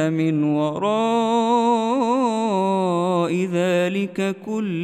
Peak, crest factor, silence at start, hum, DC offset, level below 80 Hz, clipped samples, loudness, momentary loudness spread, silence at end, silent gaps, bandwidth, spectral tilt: -6 dBFS; 12 dB; 0 s; none; under 0.1%; -74 dBFS; under 0.1%; -20 LUFS; 5 LU; 0 s; none; 13.5 kHz; -6.5 dB/octave